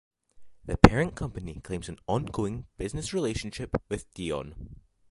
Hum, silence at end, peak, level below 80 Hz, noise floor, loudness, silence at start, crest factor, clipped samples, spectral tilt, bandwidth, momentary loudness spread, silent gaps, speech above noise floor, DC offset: none; 0.35 s; 0 dBFS; -40 dBFS; -50 dBFS; -28 LUFS; 0.4 s; 28 dB; under 0.1%; -6 dB/octave; 11.5 kHz; 19 LU; none; 22 dB; under 0.1%